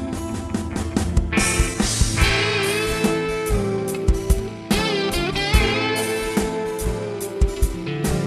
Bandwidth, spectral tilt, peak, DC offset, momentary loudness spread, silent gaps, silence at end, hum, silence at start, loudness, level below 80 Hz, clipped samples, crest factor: 15.5 kHz; -4.5 dB/octave; -2 dBFS; under 0.1%; 8 LU; none; 0 s; none; 0 s; -21 LUFS; -26 dBFS; under 0.1%; 20 dB